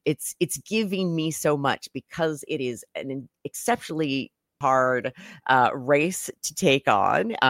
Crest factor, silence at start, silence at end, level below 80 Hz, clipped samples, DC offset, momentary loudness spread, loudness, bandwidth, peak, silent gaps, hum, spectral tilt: 18 dB; 0.05 s; 0 s; -66 dBFS; under 0.1%; under 0.1%; 14 LU; -25 LUFS; 16.5 kHz; -6 dBFS; none; none; -4 dB/octave